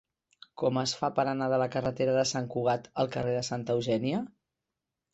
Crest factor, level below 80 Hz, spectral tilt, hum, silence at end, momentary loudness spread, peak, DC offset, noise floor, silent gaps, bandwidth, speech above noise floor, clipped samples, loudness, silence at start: 18 dB; -64 dBFS; -5 dB/octave; none; 0.85 s; 4 LU; -12 dBFS; under 0.1%; -87 dBFS; none; 8.2 kHz; 58 dB; under 0.1%; -30 LUFS; 0.55 s